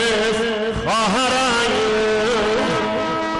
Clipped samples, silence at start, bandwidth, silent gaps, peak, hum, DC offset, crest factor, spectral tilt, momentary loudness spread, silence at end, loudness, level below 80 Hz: under 0.1%; 0 s; 11.5 kHz; none; -12 dBFS; none; under 0.1%; 6 dB; -3.5 dB/octave; 4 LU; 0 s; -18 LUFS; -42 dBFS